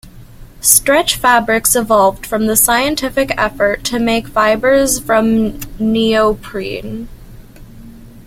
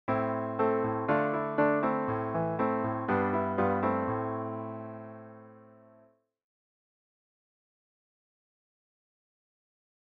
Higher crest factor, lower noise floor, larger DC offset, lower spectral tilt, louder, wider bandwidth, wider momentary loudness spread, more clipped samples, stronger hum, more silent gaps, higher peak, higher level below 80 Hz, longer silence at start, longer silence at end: second, 14 dB vs 20 dB; second, -36 dBFS vs -64 dBFS; neither; second, -2.5 dB/octave vs -10.5 dB/octave; first, -13 LUFS vs -30 LUFS; first, 16.5 kHz vs 5.4 kHz; about the same, 12 LU vs 14 LU; neither; neither; neither; first, 0 dBFS vs -14 dBFS; first, -36 dBFS vs -68 dBFS; about the same, 0.05 s vs 0.1 s; second, 0.05 s vs 4.4 s